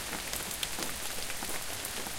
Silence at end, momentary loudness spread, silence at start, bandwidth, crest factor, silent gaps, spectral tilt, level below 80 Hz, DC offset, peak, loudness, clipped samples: 0 s; 2 LU; 0 s; 17 kHz; 24 dB; none; -1 dB/octave; -52 dBFS; under 0.1%; -12 dBFS; -35 LUFS; under 0.1%